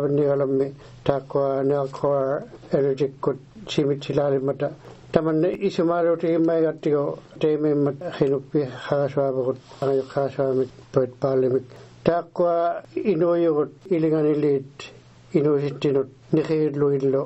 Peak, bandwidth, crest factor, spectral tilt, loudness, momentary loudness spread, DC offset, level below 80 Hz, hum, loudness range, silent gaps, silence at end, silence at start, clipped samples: -2 dBFS; 8.2 kHz; 20 dB; -8 dB/octave; -23 LUFS; 6 LU; under 0.1%; -58 dBFS; none; 2 LU; none; 0 s; 0 s; under 0.1%